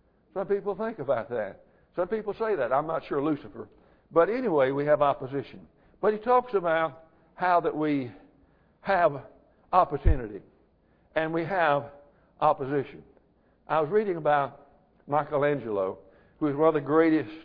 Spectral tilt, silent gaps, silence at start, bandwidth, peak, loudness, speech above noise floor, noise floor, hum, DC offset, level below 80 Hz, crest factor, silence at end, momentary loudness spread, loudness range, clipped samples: -10 dB/octave; none; 0.35 s; 5.2 kHz; -6 dBFS; -27 LUFS; 38 dB; -64 dBFS; none; under 0.1%; -42 dBFS; 20 dB; 0 s; 14 LU; 3 LU; under 0.1%